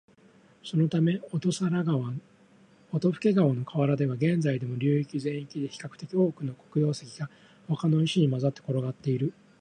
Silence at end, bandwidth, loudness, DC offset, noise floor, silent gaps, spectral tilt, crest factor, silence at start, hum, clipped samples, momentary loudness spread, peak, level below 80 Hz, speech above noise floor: 0.3 s; 10.5 kHz; -28 LUFS; under 0.1%; -58 dBFS; none; -7.5 dB/octave; 16 dB; 0.65 s; none; under 0.1%; 11 LU; -12 dBFS; -70 dBFS; 31 dB